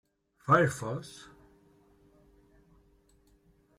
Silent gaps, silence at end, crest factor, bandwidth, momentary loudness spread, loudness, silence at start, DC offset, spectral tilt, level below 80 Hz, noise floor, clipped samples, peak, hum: none; 2.55 s; 24 dB; 15.5 kHz; 23 LU; -29 LUFS; 0.45 s; under 0.1%; -6 dB/octave; -66 dBFS; -65 dBFS; under 0.1%; -10 dBFS; none